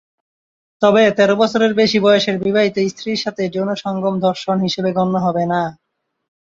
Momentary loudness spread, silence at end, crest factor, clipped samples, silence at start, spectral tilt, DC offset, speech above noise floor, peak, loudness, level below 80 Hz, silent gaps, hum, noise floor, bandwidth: 8 LU; 0.8 s; 16 dB; under 0.1%; 0.8 s; -5.5 dB/octave; under 0.1%; over 74 dB; -2 dBFS; -16 LUFS; -58 dBFS; none; none; under -90 dBFS; 7.8 kHz